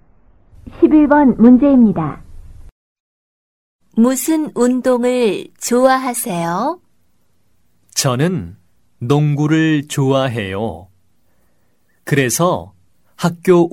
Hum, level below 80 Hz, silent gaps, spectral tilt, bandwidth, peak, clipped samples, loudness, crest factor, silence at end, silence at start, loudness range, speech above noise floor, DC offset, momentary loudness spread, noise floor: none; -46 dBFS; 2.72-3.79 s; -5.5 dB/octave; 16.5 kHz; 0 dBFS; under 0.1%; -15 LUFS; 16 dB; 0.05 s; 0.65 s; 6 LU; 49 dB; 0.2%; 14 LU; -63 dBFS